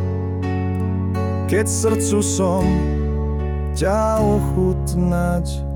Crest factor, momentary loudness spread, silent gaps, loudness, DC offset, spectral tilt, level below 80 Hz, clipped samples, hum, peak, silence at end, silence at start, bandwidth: 12 dB; 5 LU; none; -20 LUFS; under 0.1%; -6 dB/octave; -28 dBFS; under 0.1%; none; -6 dBFS; 0 s; 0 s; 18 kHz